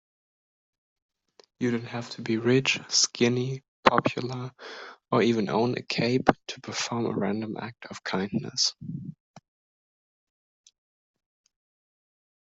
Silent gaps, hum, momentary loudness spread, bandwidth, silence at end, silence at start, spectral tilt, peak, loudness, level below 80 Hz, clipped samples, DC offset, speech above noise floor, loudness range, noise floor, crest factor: 3.68-3.83 s; none; 16 LU; 8.2 kHz; 3.35 s; 1.6 s; -4 dB/octave; -2 dBFS; -27 LUFS; -66 dBFS; under 0.1%; under 0.1%; 34 dB; 7 LU; -62 dBFS; 28 dB